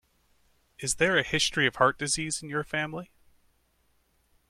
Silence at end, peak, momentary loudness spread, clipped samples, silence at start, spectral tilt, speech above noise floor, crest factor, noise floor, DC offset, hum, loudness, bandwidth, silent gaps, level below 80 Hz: 1.45 s; -8 dBFS; 10 LU; under 0.1%; 0.8 s; -2.5 dB/octave; 42 dB; 24 dB; -69 dBFS; under 0.1%; none; -27 LUFS; 16 kHz; none; -56 dBFS